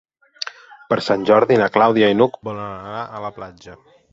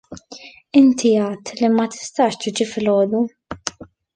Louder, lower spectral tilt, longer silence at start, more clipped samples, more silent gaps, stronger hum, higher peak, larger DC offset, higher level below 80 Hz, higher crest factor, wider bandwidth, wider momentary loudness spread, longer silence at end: about the same, -17 LUFS vs -18 LUFS; about the same, -6 dB/octave vs -5 dB/octave; first, 0.4 s vs 0.1 s; neither; neither; neither; about the same, -2 dBFS vs -2 dBFS; neither; about the same, -58 dBFS vs -56 dBFS; about the same, 18 dB vs 16 dB; second, 7.8 kHz vs 9.8 kHz; about the same, 16 LU vs 18 LU; about the same, 0.4 s vs 0.3 s